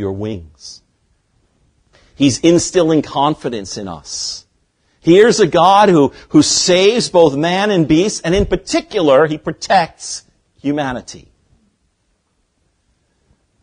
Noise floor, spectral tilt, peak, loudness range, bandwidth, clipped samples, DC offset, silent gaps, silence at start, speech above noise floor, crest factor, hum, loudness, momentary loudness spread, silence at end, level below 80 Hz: -64 dBFS; -4.5 dB/octave; 0 dBFS; 10 LU; 10.5 kHz; under 0.1%; under 0.1%; none; 0 s; 51 dB; 16 dB; none; -13 LUFS; 17 LU; 2.45 s; -40 dBFS